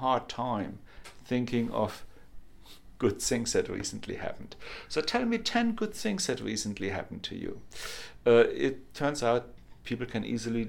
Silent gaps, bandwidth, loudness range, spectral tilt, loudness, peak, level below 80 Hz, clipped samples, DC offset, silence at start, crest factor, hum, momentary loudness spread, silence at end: none; 17 kHz; 4 LU; -4.5 dB/octave; -31 LUFS; -10 dBFS; -54 dBFS; under 0.1%; under 0.1%; 0 s; 22 dB; none; 13 LU; 0 s